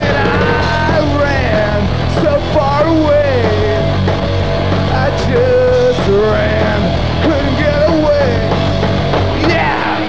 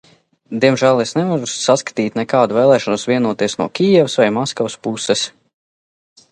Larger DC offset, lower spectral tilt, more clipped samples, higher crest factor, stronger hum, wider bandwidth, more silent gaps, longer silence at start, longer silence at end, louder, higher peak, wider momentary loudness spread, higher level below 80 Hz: first, 4% vs under 0.1%; first, -7 dB/octave vs -4.5 dB/octave; neither; about the same, 12 dB vs 16 dB; neither; second, 8 kHz vs 11 kHz; neither; second, 0 s vs 0.5 s; second, 0 s vs 1.05 s; first, -13 LUFS vs -16 LUFS; about the same, -2 dBFS vs 0 dBFS; second, 3 LU vs 8 LU; first, -22 dBFS vs -62 dBFS